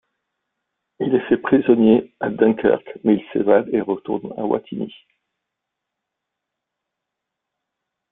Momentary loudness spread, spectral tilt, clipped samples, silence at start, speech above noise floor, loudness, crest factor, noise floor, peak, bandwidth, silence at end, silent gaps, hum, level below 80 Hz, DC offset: 12 LU; -11.5 dB/octave; under 0.1%; 1 s; 63 dB; -19 LUFS; 20 dB; -82 dBFS; -2 dBFS; 3.9 kHz; 3.2 s; none; none; -60 dBFS; under 0.1%